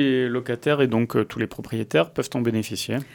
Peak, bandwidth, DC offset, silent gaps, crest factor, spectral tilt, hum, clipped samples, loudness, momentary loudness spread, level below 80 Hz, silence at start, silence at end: -6 dBFS; 19 kHz; under 0.1%; none; 18 dB; -6 dB/octave; none; under 0.1%; -24 LUFS; 7 LU; -58 dBFS; 0 s; 0 s